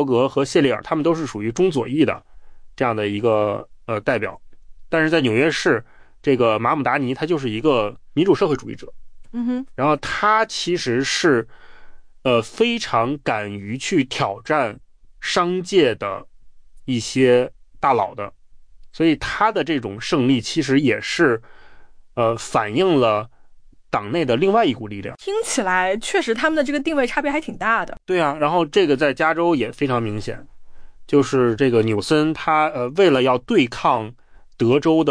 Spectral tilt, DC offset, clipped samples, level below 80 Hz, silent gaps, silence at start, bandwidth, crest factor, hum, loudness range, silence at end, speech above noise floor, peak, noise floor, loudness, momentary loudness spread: -5 dB/octave; under 0.1%; under 0.1%; -48 dBFS; none; 0 s; 10.5 kHz; 16 dB; none; 3 LU; 0 s; 26 dB; -4 dBFS; -45 dBFS; -20 LUFS; 9 LU